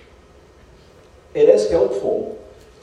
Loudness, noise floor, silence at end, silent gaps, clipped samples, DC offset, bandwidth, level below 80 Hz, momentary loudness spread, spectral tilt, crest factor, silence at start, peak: -17 LUFS; -48 dBFS; 0.4 s; none; under 0.1%; under 0.1%; 10 kHz; -50 dBFS; 17 LU; -5.5 dB/octave; 20 dB; 1.35 s; 0 dBFS